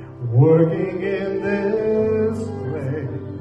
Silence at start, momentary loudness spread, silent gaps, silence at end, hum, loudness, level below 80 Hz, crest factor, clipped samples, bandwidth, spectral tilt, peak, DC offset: 0 s; 12 LU; none; 0 s; none; -20 LUFS; -52 dBFS; 16 dB; under 0.1%; 8.6 kHz; -9.5 dB/octave; -4 dBFS; under 0.1%